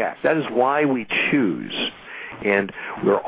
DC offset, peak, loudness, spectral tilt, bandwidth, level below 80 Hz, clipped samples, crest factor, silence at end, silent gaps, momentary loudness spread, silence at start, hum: under 0.1%; -6 dBFS; -21 LUFS; -9 dB/octave; 4 kHz; -62 dBFS; under 0.1%; 16 dB; 0 s; none; 9 LU; 0 s; none